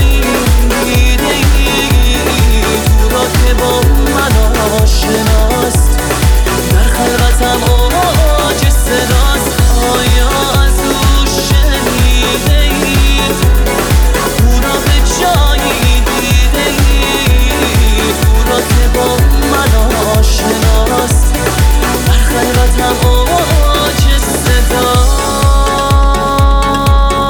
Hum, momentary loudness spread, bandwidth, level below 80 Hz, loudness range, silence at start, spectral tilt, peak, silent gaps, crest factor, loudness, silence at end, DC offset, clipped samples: none; 1 LU; over 20 kHz; -10 dBFS; 0 LU; 0 s; -4.5 dB/octave; 0 dBFS; none; 8 dB; -10 LUFS; 0 s; under 0.1%; under 0.1%